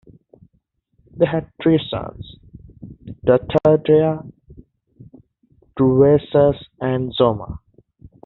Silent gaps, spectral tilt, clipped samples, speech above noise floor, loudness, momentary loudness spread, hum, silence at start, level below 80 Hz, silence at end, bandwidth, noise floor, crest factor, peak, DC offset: none; -6.5 dB/octave; under 0.1%; 49 dB; -18 LUFS; 22 LU; none; 1.15 s; -46 dBFS; 0.7 s; 4.2 kHz; -66 dBFS; 18 dB; -2 dBFS; under 0.1%